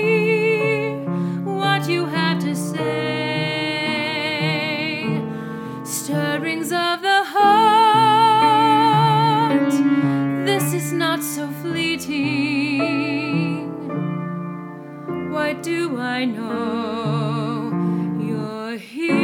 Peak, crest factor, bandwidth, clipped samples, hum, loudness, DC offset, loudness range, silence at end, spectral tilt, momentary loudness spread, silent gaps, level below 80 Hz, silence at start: -4 dBFS; 16 dB; 18.5 kHz; under 0.1%; none; -20 LUFS; under 0.1%; 9 LU; 0 s; -5 dB/octave; 12 LU; none; -68 dBFS; 0 s